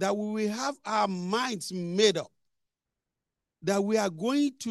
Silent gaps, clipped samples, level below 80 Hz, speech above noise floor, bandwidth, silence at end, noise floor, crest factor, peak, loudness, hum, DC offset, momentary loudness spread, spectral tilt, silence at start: none; under 0.1%; -78 dBFS; 60 dB; 12.5 kHz; 0 s; -88 dBFS; 20 dB; -10 dBFS; -28 LUFS; none; under 0.1%; 9 LU; -4.5 dB/octave; 0 s